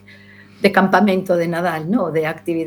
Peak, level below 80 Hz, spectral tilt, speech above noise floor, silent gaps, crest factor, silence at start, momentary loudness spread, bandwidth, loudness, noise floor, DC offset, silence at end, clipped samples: 0 dBFS; -60 dBFS; -6.5 dB/octave; 27 dB; none; 18 dB; 0.1 s; 7 LU; 19 kHz; -17 LUFS; -43 dBFS; under 0.1%; 0 s; under 0.1%